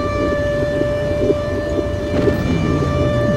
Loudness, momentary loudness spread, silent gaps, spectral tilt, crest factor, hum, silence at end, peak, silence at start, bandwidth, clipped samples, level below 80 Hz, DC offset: -18 LUFS; 3 LU; none; -7.5 dB/octave; 14 dB; none; 0 s; -4 dBFS; 0 s; 16 kHz; under 0.1%; -30 dBFS; under 0.1%